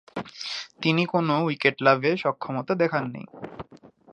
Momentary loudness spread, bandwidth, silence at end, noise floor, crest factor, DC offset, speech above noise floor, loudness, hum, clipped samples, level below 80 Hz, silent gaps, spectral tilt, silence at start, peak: 19 LU; 9.6 kHz; 0.25 s; -52 dBFS; 22 dB; under 0.1%; 28 dB; -24 LUFS; none; under 0.1%; -66 dBFS; none; -6 dB/octave; 0.15 s; -4 dBFS